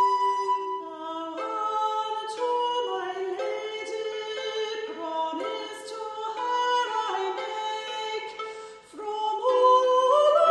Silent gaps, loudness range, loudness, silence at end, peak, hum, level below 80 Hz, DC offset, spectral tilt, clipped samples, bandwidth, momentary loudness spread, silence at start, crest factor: none; 6 LU; -27 LUFS; 0 s; -8 dBFS; none; -78 dBFS; under 0.1%; -1.5 dB/octave; under 0.1%; 10.5 kHz; 15 LU; 0 s; 18 dB